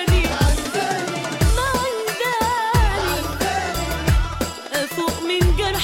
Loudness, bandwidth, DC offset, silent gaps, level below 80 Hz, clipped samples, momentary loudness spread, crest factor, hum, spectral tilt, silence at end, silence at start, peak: -21 LUFS; 17 kHz; under 0.1%; none; -24 dBFS; under 0.1%; 5 LU; 14 dB; none; -4.5 dB/octave; 0 s; 0 s; -6 dBFS